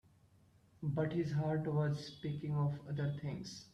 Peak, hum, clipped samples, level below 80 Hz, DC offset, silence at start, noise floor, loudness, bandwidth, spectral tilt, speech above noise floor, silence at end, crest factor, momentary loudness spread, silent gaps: -24 dBFS; none; under 0.1%; -68 dBFS; under 0.1%; 0.8 s; -68 dBFS; -39 LUFS; 8.2 kHz; -7.5 dB/octave; 30 dB; 0.05 s; 14 dB; 7 LU; none